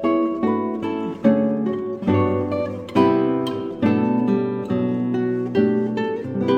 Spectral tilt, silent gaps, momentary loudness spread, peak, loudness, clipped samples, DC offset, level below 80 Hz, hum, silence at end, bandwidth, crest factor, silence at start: -8.5 dB/octave; none; 6 LU; -2 dBFS; -21 LUFS; under 0.1%; under 0.1%; -58 dBFS; none; 0 s; 9 kHz; 18 dB; 0 s